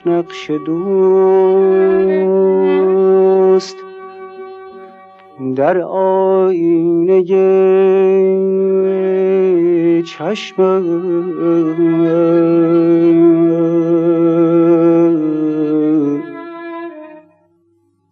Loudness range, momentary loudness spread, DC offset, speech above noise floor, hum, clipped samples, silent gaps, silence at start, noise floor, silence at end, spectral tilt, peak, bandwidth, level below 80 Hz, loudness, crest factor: 4 LU; 16 LU; under 0.1%; 46 dB; none; under 0.1%; none; 0.05 s; -58 dBFS; 0.95 s; -8.5 dB/octave; -2 dBFS; 7 kHz; -64 dBFS; -12 LUFS; 10 dB